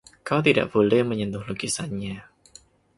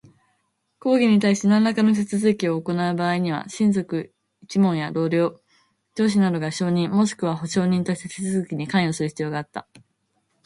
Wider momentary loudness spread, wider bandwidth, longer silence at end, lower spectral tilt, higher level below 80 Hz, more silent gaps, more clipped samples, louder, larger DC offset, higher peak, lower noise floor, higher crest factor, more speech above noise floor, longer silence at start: about the same, 12 LU vs 10 LU; about the same, 11.5 kHz vs 11.5 kHz; about the same, 0.75 s vs 0.85 s; about the same, -5 dB/octave vs -6 dB/octave; first, -56 dBFS vs -64 dBFS; neither; neither; about the same, -23 LUFS vs -22 LUFS; neither; first, -4 dBFS vs -8 dBFS; second, -53 dBFS vs -71 dBFS; first, 20 dB vs 14 dB; second, 30 dB vs 50 dB; second, 0.25 s vs 0.85 s